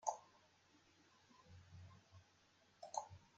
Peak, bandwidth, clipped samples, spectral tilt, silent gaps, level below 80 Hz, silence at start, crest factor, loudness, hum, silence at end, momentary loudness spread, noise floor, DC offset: -24 dBFS; 8.8 kHz; under 0.1%; -3 dB/octave; none; -86 dBFS; 0 s; 30 dB; -53 LUFS; none; 0 s; 19 LU; -74 dBFS; under 0.1%